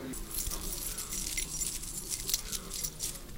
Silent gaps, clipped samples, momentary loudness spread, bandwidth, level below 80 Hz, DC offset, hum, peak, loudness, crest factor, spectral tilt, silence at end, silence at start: none; under 0.1%; 5 LU; 17 kHz; -44 dBFS; under 0.1%; none; -12 dBFS; -35 LUFS; 26 dB; -1 dB/octave; 0 s; 0 s